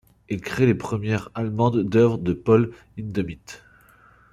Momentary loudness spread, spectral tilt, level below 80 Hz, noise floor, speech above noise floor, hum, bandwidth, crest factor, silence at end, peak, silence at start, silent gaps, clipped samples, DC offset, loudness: 15 LU; -8 dB/octave; -52 dBFS; -54 dBFS; 32 dB; none; 13 kHz; 18 dB; 0.75 s; -4 dBFS; 0.3 s; none; under 0.1%; under 0.1%; -23 LUFS